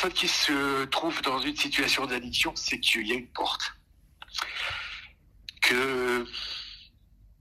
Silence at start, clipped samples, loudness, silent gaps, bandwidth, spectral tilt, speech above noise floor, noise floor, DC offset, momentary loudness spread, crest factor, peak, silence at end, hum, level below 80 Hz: 0 s; under 0.1%; -27 LUFS; none; 16 kHz; -1.5 dB/octave; 29 dB; -58 dBFS; under 0.1%; 13 LU; 22 dB; -8 dBFS; 0.55 s; none; -56 dBFS